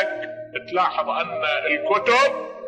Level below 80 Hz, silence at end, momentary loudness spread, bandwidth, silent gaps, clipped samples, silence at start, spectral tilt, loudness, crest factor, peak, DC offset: -68 dBFS; 0 s; 12 LU; 10 kHz; none; under 0.1%; 0 s; -3 dB/octave; -21 LUFS; 16 dB; -6 dBFS; under 0.1%